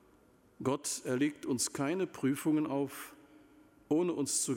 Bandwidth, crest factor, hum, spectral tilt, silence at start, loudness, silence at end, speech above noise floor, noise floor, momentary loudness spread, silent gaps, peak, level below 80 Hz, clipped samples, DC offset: 16.5 kHz; 16 dB; none; -4 dB/octave; 0.6 s; -34 LUFS; 0 s; 31 dB; -65 dBFS; 7 LU; none; -18 dBFS; -74 dBFS; under 0.1%; under 0.1%